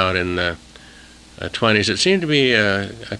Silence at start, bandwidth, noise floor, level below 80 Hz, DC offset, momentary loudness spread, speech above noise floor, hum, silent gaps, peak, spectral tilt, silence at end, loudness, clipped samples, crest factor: 0 s; 11.5 kHz; -44 dBFS; -48 dBFS; under 0.1%; 12 LU; 25 dB; none; none; 0 dBFS; -4 dB/octave; 0 s; -17 LUFS; under 0.1%; 18 dB